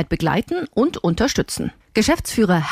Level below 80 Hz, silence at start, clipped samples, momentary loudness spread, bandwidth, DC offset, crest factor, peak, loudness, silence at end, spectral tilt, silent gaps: -38 dBFS; 0 s; under 0.1%; 6 LU; 16 kHz; under 0.1%; 14 dB; -4 dBFS; -20 LUFS; 0 s; -5 dB/octave; none